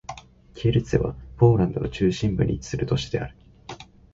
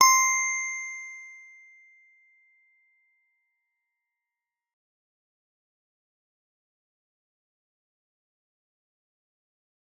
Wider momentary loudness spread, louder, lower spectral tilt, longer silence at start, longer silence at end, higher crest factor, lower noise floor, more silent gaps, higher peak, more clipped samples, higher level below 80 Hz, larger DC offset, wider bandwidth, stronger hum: second, 22 LU vs 25 LU; about the same, -24 LUFS vs -24 LUFS; first, -7 dB/octave vs 4.5 dB/octave; about the same, 0.1 s vs 0 s; second, 0.3 s vs 8.65 s; second, 20 dB vs 30 dB; second, -43 dBFS vs -89 dBFS; neither; about the same, -4 dBFS vs -4 dBFS; neither; first, -40 dBFS vs under -90 dBFS; neither; second, 7.8 kHz vs 12.5 kHz; neither